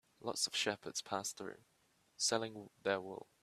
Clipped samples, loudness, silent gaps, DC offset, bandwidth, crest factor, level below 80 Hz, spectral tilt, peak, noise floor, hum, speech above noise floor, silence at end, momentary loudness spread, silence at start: under 0.1%; -39 LUFS; none; under 0.1%; 14.5 kHz; 24 dB; -84 dBFS; -1.5 dB/octave; -18 dBFS; -68 dBFS; none; 28 dB; 0.2 s; 12 LU; 0.2 s